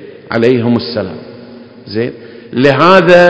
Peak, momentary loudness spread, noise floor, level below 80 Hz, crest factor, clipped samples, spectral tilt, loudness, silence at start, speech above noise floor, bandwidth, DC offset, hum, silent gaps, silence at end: 0 dBFS; 20 LU; -33 dBFS; -48 dBFS; 10 dB; 2%; -7 dB/octave; -11 LUFS; 0 s; 24 dB; 8 kHz; under 0.1%; none; none; 0 s